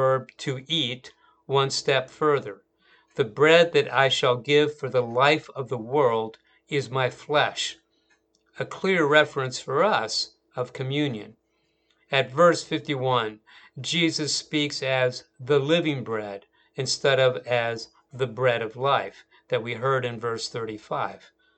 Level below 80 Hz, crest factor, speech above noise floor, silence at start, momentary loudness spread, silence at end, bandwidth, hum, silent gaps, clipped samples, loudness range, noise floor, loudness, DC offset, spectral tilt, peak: -70 dBFS; 24 dB; 46 dB; 0 s; 13 LU; 0.4 s; 9.2 kHz; none; none; under 0.1%; 5 LU; -71 dBFS; -24 LUFS; under 0.1%; -4 dB/octave; -2 dBFS